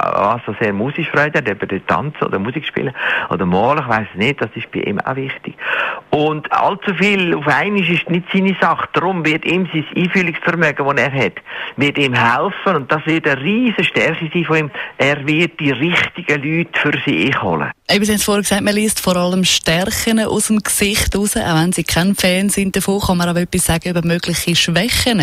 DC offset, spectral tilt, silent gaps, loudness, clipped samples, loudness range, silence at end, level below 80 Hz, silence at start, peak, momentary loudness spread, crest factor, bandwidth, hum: under 0.1%; -4 dB/octave; none; -16 LUFS; under 0.1%; 3 LU; 0 s; -38 dBFS; 0 s; -2 dBFS; 6 LU; 14 dB; 16 kHz; none